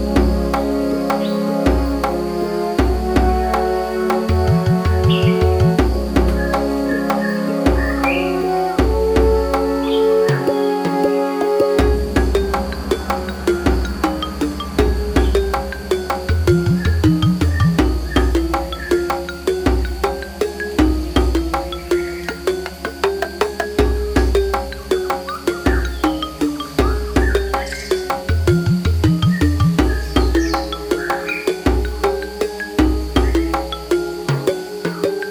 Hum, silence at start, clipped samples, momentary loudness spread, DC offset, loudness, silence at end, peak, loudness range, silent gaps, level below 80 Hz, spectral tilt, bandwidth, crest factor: none; 0 s; under 0.1%; 6 LU; under 0.1%; -18 LUFS; 0 s; -2 dBFS; 3 LU; none; -24 dBFS; -6.5 dB/octave; 19.5 kHz; 14 dB